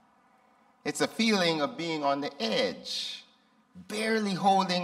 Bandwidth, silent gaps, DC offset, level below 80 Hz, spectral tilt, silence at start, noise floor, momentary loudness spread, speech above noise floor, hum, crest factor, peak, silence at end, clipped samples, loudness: 15 kHz; none; under 0.1%; -76 dBFS; -4 dB/octave; 0.85 s; -64 dBFS; 11 LU; 36 dB; none; 18 dB; -12 dBFS; 0 s; under 0.1%; -29 LUFS